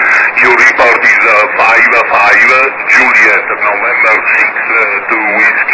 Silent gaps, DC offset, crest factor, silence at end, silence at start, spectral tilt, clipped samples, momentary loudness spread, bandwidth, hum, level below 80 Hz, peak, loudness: none; 0.2%; 8 dB; 0 s; 0 s; -2.5 dB/octave; 2%; 5 LU; 8 kHz; none; -50 dBFS; 0 dBFS; -6 LUFS